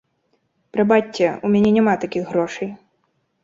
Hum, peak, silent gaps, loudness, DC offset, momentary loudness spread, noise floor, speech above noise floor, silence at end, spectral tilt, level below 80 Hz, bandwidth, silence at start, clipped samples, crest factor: none; -2 dBFS; none; -19 LUFS; under 0.1%; 11 LU; -68 dBFS; 50 dB; 0.7 s; -7 dB/octave; -58 dBFS; 7.6 kHz; 0.75 s; under 0.1%; 18 dB